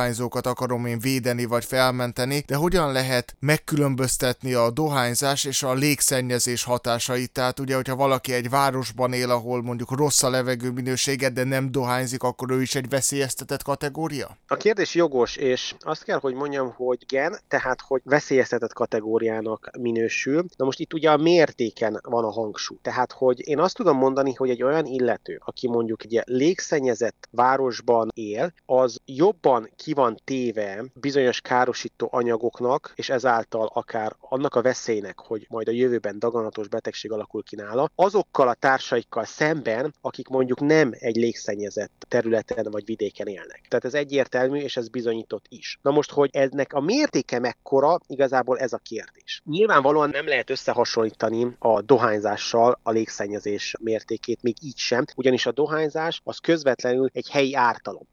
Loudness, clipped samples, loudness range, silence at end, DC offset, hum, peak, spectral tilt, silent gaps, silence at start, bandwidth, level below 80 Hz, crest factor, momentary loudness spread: -23 LUFS; under 0.1%; 3 LU; 0.15 s; under 0.1%; none; -4 dBFS; -4.5 dB/octave; none; 0 s; 17.5 kHz; -54 dBFS; 20 dB; 9 LU